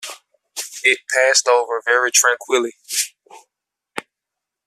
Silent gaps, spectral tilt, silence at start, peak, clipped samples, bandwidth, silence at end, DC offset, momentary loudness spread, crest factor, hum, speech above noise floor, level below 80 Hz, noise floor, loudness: none; 1.5 dB/octave; 0 s; 0 dBFS; under 0.1%; 15 kHz; 0.65 s; under 0.1%; 19 LU; 20 dB; none; 66 dB; -78 dBFS; -83 dBFS; -16 LUFS